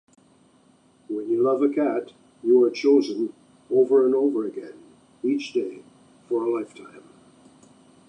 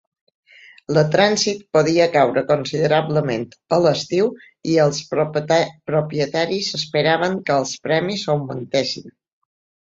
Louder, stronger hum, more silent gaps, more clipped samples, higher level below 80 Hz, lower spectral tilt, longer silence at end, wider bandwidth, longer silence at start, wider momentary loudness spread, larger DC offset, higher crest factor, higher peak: second, -23 LUFS vs -19 LUFS; neither; neither; neither; second, -78 dBFS vs -60 dBFS; about the same, -6 dB/octave vs -5 dB/octave; first, 1.1 s vs 0.8 s; first, 9.4 kHz vs 8 kHz; first, 1.1 s vs 0.9 s; first, 15 LU vs 7 LU; neither; about the same, 16 dB vs 18 dB; second, -8 dBFS vs -2 dBFS